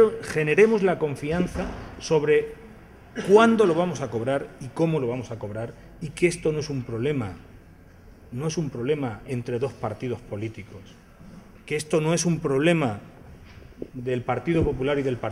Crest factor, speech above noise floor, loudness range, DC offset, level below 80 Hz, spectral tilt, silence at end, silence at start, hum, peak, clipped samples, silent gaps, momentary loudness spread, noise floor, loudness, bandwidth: 22 dB; 25 dB; 8 LU; under 0.1%; -48 dBFS; -6 dB/octave; 0 s; 0 s; none; -4 dBFS; under 0.1%; none; 18 LU; -49 dBFS; -24 LUFS; 13 kHz